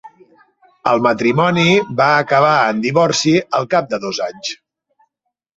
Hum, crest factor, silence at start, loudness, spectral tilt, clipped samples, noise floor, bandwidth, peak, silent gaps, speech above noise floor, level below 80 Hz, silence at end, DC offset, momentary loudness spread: none; 16 dB; 0.05 s; -15 LUFS; -4.5 dB/octave; under 0.1%; -76 dBFS; 8.2 kHz; 0 dBFS; none; 61 dB; -58 dBFS; 1.05 s; under 0.1%; 10 LU